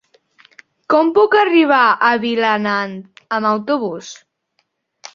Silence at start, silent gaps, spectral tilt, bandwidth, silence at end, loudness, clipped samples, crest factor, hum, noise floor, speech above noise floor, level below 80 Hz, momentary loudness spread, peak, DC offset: 0.9 s; none; -5 dB/octave; 7.4 kHz; 0.05 s; -15 LUFS; under 0.1%; 16 dB; none; -67 dBFS; 53 dB; -64 dBFS; 14 LU; 0 dBFS; under 0.1%